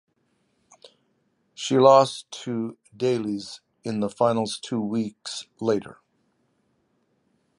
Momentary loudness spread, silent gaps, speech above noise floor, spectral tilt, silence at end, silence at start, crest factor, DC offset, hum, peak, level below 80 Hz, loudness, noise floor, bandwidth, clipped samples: 18 LU; none; 47 dB; -5.5 dB/octave; 1.65 s; 1.6 s; 22 dB; under 0.1%; none; -2 dBFS; -70 dBFS; -24 LUFS; -70 dBFS; 11.5 kHz; under 0.1%